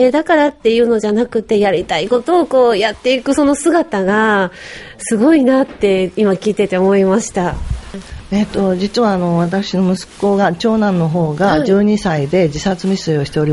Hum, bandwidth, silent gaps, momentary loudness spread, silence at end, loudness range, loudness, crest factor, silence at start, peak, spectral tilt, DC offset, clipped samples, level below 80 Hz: none; 11.5 kHz; none; 7 LU; 0 s; 2 LU; -14 LUFS; 12 dB; 0 s; 0 dBFS; -6 dB/octave; under 0.1%; under 0.1%; -36 dBFS